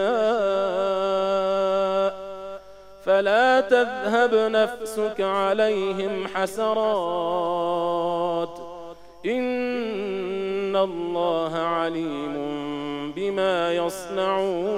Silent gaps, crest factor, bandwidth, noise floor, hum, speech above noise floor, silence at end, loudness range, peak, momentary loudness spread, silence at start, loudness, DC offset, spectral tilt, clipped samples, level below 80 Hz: none; 18 dB; 16 kHz; -44 dBFS; 50 Hz at -60 dBFS; 21 dB; 0 s; 5 LU; -6 dBFS; 10 LU; 0 s; -24 LUFS; under 0.1%; -5 dB/octave; under 0.1%; -60 dBFS